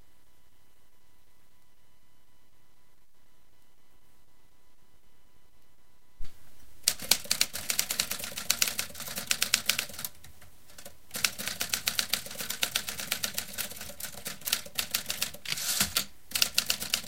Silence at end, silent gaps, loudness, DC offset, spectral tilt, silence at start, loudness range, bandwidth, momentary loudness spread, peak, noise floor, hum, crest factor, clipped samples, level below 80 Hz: 0 s; none; -30 LUFS; 0.6%; 0.5 dB/octave; 4.5 s; 4 LU; 17 kHz; 12 LU; -2 dBFS; -66 dBFS; none; 34 dB; under 0.1%; -58 dBFS